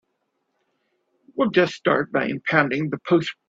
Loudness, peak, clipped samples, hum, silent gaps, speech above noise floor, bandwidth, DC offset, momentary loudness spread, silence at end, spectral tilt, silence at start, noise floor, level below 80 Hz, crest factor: -21 LUFS; -2 dBFS; under 0.1%; none; none; 53 dB; 7.8 kHz; under 0.1%; 5 LU; 0.15 s; -6.5 dB/octave; 1.35 s; -74 dBFS; -64 dBFS; 22 dB